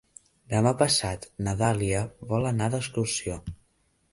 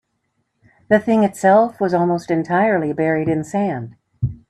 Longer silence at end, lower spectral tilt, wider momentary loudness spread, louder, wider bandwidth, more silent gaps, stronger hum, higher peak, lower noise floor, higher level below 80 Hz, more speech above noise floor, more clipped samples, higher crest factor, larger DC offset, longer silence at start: first, 0.55 s vs 0.15 s; second, -4.5 dB/octave vs -7.5 dB/octave; about the same, 11 LU vs 11 LU; second, -27 LUFS vs -18 LUFS; second, 11.5 kHz vs 13 kHz; neither; neither; second, -8 dBFS vs 0 dBFS; about the same, -69 dBFS vs -70 dBFS; about the same, -48 dBFS vs -48 dBFS; second, 42 dB vs 53 dB; neither; about the same, 20 dB vs 18 dB; neither; second, 0.5 s vs 0.9 s